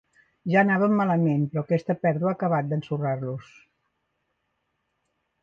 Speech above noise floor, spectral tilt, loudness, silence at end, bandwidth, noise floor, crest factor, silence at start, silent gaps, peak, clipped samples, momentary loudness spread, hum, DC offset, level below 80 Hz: 53 dB; -9.5 dB/octave; -24 LUFS; 2 s; 6.8 kHz; -76 dBFS; 18 dB; 0.45 s; none; -8 dBFS; under 0.1%; 10 LU; none; under 0.1%; -68 dBFS